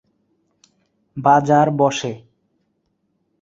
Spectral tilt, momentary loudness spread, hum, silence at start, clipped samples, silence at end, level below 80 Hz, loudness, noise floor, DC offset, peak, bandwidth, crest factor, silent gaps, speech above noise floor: -6 dB/octave; 20 LU; none; 1.15 s; under 0.1%; 1.25 s; -62 dBFS; -17 LUFS; -69 dBFS; under 0.1%; -2 dBFS; 7.8 kHz; 20 dB; none; 53 dB